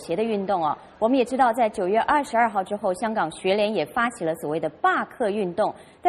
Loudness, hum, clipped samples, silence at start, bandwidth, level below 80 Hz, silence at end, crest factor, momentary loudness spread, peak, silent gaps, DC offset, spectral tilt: -24 LUFS; none; under 0.1%; 0 s; 13.5 kHz; -60 dBFS; 0 s; 16 dB; 6 LU; -8 dBFS; none; under 0.1%; -5 dB/octave